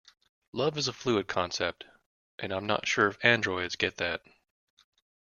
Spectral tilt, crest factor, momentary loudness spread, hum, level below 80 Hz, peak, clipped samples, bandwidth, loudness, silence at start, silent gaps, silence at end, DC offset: -3.5 dB/octave; 26 dB; 13 LU; none; -66 dBFS; -6 dBFS; under 0.1%; 7.4 kHz; -29 LUFS; 0.55 s; 2.06-2.38 s; 1.1 s; under 0.1%